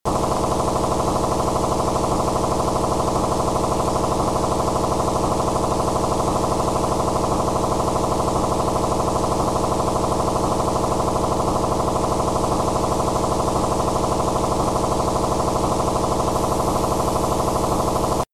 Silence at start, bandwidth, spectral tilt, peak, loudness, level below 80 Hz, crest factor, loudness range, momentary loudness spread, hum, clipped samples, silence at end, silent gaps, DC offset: 0.05 s; 15.5 kHz; -5.5 dB/octave; -10 dBFS; -21 LUFS; -32 dBFS; 10 dB; 0 LU; 0 LU; none; under 0.1%; 0.1 s; none; under 0.1%